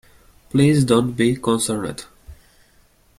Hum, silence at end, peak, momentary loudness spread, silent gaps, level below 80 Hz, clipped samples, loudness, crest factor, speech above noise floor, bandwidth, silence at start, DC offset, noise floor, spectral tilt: none; 0.85 s; -2 dBFS; 12 LU; none; -50 dBFS; under 0.1%; -19 LUFS; 18 dB; 38 dB; 15 kHz; 0.55 s; under 0.1%; -56 dBFS; -5.5 dB/octave